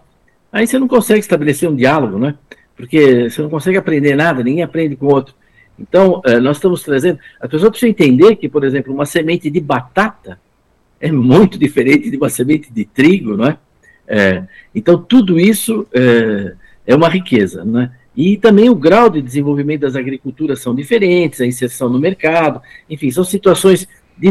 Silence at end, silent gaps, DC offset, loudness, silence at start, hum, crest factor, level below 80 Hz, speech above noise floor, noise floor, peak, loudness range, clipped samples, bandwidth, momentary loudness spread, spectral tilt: 0 s; none; under 0.1%; -12 LUFS; 0.55 s; none; 12 dB; -48 dBFS; 44 dB; -56 dBFS; 0 dBFS; 3 LU; under 0.1%; 13 kHz; 10 LU; -6 dB/octave